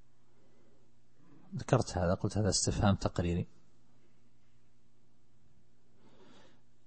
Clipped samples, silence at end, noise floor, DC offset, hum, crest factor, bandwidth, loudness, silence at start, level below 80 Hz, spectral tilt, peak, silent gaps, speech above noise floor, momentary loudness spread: under 0.1%; 3.4 s; -71 dBFS; 0.3%; 60 Hz at -65 dBFS; 26 dB; 8.4 kHz; -32 LUFS; 1.5 s; -52 dBFS; -5 dB/octave; -12 dBFS; none; 40 dB; 13 LU